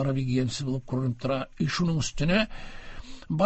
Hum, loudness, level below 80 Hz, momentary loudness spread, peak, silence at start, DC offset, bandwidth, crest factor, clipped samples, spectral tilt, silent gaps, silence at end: none; -28 LUFS; -46 dBFS; 19 LU; -10 dBFS; 0 s; under 0.1%; 8.4 kHz; 18 dB; under 0.1%; -5.5 dB/octave; none; 0 s